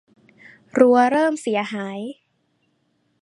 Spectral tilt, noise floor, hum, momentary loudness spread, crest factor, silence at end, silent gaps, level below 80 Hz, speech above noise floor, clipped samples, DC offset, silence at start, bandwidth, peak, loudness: -5 dB/octave; -68 dBFS; none; 17 LU; 20 dB; 1.1 s; none; -72 dBFS; 49 dB; under 0.1%; under 0.1%; 0.75 s; 11.5 kHz; -2 dBFS; -19 LUFS